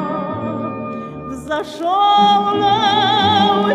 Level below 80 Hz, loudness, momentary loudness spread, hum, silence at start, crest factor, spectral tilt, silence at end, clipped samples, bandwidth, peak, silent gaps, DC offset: -50 dBFS; -15 LUFS; 15 LU; none; 0 s; 14 dB; -5 dB/octave; 0 s; under 0.1%; 11.5 kHz; -2 dBFS; none; under 0.1%